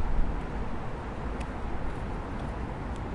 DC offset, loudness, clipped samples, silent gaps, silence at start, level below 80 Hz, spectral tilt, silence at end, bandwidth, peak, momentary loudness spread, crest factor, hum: under 0.1%; -36 LUFS; under 0.1%; none; 0 s; -34 dBFS; -7.5 dB/octave; 0 s; 10.5 kHz; -14 dBFS; 3 LU; 16 dB; none